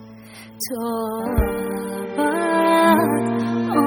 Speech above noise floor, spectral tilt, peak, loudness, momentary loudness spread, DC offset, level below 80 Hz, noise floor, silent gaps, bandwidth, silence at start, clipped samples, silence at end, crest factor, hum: 18 dB; -5.5 dB/octave; -4 dBFS; -20 LUFS; 13 LU; under 0.1%; -34 dBFS; -41 dBFS; none; 19 kHz; 0 s; under 0.1%; 0 s; 16 dB; none